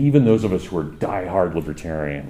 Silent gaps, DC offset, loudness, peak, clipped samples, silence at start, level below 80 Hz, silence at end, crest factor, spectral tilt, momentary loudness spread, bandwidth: none; under 0.1%; -21 LUFS; -2 dBFS; under 0.1%; 0 s; -42 dBFS; 0 s; 18 dB; -8.5 dB/octave; 11 LU; 12 kHz